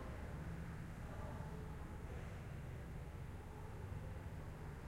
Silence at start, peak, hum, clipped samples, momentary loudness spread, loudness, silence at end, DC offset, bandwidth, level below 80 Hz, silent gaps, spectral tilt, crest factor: 0 s; -36 dBFS; none; under 0.1%; 2 LU; -51 LUFS; 0 s; under 0.1%; 16 kHz; -54 dBFS; none; -7 dB/octave; 14 dB